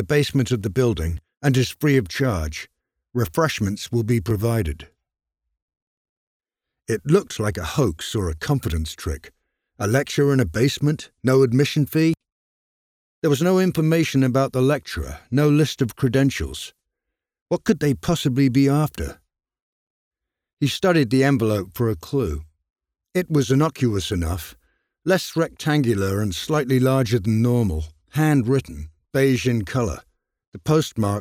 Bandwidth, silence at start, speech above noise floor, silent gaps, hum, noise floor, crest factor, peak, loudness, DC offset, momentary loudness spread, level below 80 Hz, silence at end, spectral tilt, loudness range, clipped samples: 17.5 kHz; 0 s; 63 dB; 5.62-5.68 s, 5.82-6.40 s, 12.32-13.22 s, 17.42-17.46 s, 19.62-20.11 s, 20.53-20.57 s, 22.70-22.74 s, 30.47-30.52 s; none; -83 dBFS; 18 dB; -4 dBFS; -21 LUFS; under 0.1%; 12 LU; -40 dBFS; 0 s; -6 dB/octave; 4 LU; under 0.1%